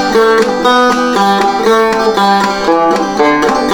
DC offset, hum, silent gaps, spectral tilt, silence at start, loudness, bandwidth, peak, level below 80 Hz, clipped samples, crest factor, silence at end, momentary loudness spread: under 0.1%; none; none; -4 dB/octave; 0 s; -10 LUFS; 19.5 kHz; 0 dBFS; -40 dBFS; under 0.1%; 10 dB; 0 s; 2 LU